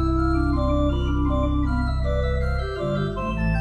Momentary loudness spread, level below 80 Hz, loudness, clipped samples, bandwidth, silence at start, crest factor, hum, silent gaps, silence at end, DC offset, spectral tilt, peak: 4 LU; -26 dBFS; -24 LUFS; under 0.1%; 8.4 kHz; 0 s; 12 dB; none; none; 0 s; under 0.1%; -8.5 dB/octave; -10 dBFS